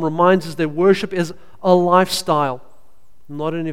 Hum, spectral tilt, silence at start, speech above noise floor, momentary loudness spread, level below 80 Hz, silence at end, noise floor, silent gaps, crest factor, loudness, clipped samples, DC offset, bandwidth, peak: none; -5.5 dB/octave; 0 s; 39 dB; 12 LU; -54 dBFS; 0 s; -56 dBFS; none; 18 dB; -17 LUFS; under 0.1%; 2%; 16 kHz; 0 dBFS